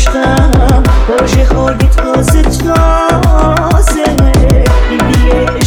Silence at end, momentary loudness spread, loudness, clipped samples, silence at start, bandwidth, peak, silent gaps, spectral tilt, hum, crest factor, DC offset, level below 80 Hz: 0 s; 2 LU; -9 LUFS; 0.2%; 0 s; 16 kHz; 0 dBFS; none; -6 dB/octave; none; 8 dB; under 0.1%; -10 dBFS